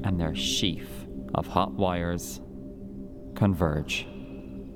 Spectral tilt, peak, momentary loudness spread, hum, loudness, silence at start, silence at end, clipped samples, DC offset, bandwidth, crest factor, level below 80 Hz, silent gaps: -5 dB/octave; -6 dBFS; 16 LU; none; -28 LUFS; 0 s; 0 s; under 0.1%; under 0.1%; 19 kHz; 24 dB; -44 dBFS; none